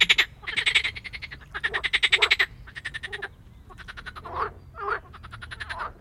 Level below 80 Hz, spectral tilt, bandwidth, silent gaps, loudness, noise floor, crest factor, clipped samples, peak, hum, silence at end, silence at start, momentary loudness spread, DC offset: -48 dBFS; -1 dB/octave; 16.5 kHz; none; -24 LUFS; -48 dBFS; 26 dB; under 0.1%; -2 dBFS; none; 0.05 s; 0 s; 20 LU; under 0.1%